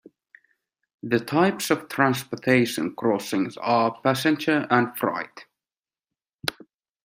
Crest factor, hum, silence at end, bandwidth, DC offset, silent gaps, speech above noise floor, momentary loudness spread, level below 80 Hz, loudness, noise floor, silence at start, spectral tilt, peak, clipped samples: 22 dB; none; 0.55 s; 16 kHz; under 0.1%; none; over 67 dB; 10 LU; -68 dBFS; -24 LUFS; under -90 dBFS; 1.05 s; -5 dB/octave; -2 dBFS; under 0.1%